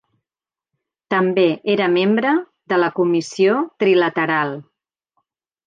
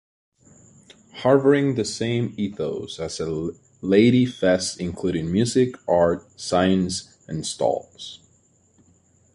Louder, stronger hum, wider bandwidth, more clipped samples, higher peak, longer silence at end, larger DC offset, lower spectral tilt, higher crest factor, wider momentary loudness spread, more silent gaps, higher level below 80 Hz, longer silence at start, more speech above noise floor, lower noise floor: first, -18 LUFS vs -22 LUFS; neither; second, 9.2 kHz vs 11.5 kHz; neither; about the same, -4 dBFS vs -4 dBFS; second, 1.05 s vs 1.2 s; neither; about the same, -6 dB/octave vs -5.5 dB/octave; second, 14 dB vs 20 dB; second, 6 LU vs 13 LU; neither; second, -72 dBFS vs -50 dBFS; about the same, 1.1 s vs 1.15 s; first, over 73 dB vs 39 dB; first, under -90 dBFS vs -60 dBFS